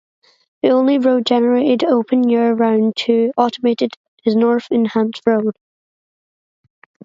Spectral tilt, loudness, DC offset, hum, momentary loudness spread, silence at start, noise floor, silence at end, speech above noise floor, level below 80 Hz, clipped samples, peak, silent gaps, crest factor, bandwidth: -6.5 dB/octave; -16 LUFS; under 0.1%; none; 5 LU; 0.65 s; under -90 dBFS; 1.55 s; over 75 dB; -68 dBFS; under 0.1%; 0 dBFS; 3.96-4.17 s; 16 dB; 7.6 kHz